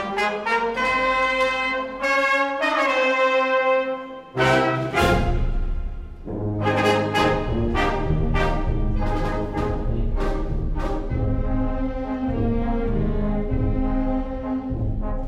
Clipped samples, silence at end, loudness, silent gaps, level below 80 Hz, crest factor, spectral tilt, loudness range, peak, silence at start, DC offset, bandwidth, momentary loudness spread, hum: under 0.1%; 0 s; -23 LUFS; none; -26 dBFS; 16 dB; -6 dB/octave; 6 LU; -6 dBFS; 0 s; under 0.1%; 12 kHz; 9 LU; none